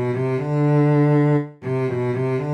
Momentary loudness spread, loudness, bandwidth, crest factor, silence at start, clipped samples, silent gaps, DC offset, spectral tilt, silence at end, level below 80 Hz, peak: 7 LU; -20 LUFS; 5.8 kHz; 12 dB; 0 s; under 0.1%; none; under 0.1%; -10 dB/octave; 0 s; -58 dBFS; -8 dBFS